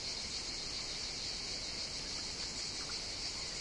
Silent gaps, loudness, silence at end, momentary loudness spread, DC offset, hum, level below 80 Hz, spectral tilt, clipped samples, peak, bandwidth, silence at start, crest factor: none; -39 LUFS; 0 s; 1 LU; under 0.1%; none; -56 dBFS; -1 dB/octave; under 0.1%; -28 dBFS; 11.5 kHz; 0 s; 14 dB